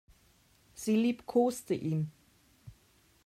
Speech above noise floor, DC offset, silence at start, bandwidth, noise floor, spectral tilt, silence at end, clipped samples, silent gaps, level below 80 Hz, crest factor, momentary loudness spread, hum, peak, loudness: 36 dB; under 0.1%; 0.75 s; 15 kHz; -66 dBFS; -6.5 dB/octave; 0.55 s; under 0.1%; none; -68 dBFS; 18 dB; 11 LU; none; -16 dBFS; -32 LUFS